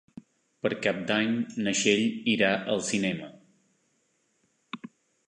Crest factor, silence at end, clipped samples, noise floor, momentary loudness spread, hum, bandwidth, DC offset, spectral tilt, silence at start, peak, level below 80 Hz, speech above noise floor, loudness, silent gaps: 22 dB; 0.4 s; under 0.1%; -72 dBFS; 19 LU; none; 11 kHz; under 0.1%; -3.5 dB/octave; 0.65 s; -8 dBFS; -70 dBFS; 45 dB; -27 LUFS; none